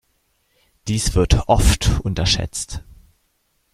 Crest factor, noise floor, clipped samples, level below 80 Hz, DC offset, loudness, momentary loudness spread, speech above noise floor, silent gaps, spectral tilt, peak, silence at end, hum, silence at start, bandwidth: 18 dB; -66 dBFS; under 0.1%; -24 dBFS; under 0.1%; -19 LUFS; 14 LU; 49 dB; none; -4.5 dB/octave; -2 dBFS; 0.95 s; none; 0.85 s; 15 kHz